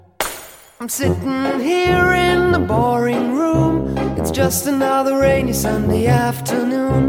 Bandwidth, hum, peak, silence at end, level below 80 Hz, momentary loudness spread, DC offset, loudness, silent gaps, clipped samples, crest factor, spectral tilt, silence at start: 17 kHz; none; -2 dBFS; 0 s; -34 dBFS; 6 LU; under 0.1%; -17 LUFS; none; under 0.1%; 14 dB; -5.5 dB/octave; 0.2 s